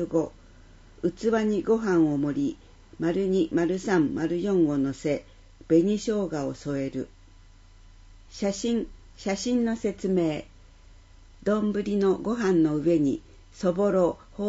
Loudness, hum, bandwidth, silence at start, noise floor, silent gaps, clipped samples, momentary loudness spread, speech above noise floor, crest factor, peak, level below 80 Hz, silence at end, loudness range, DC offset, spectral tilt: -26 LUFS; none; 8 kHz; 0 s; -51 dBFS; none; under 0.1%; 9 LU; 26 dB; 16 dB; -10 dBFS; -52 dBFS; 0 s; 5 LU; under 0.1%; -6.5 dB/octave